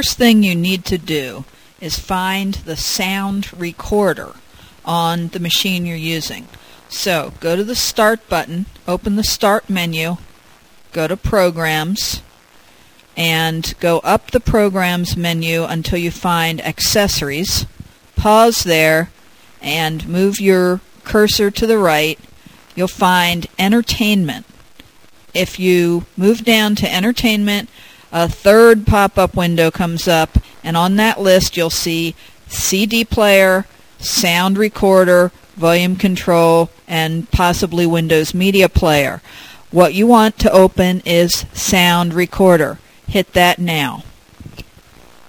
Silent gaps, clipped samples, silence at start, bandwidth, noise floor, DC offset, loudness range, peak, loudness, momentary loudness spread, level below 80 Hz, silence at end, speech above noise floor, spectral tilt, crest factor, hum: none; under 0.1%; 0 s; 16 kHz; -47 dBFS; 0.3%; 6 LU; 0 dBFS; -14 LUFS; 11 LU; -32 dBFS; 0.65 s; 33 dB; -4.5 dB/octave; 16 dB; none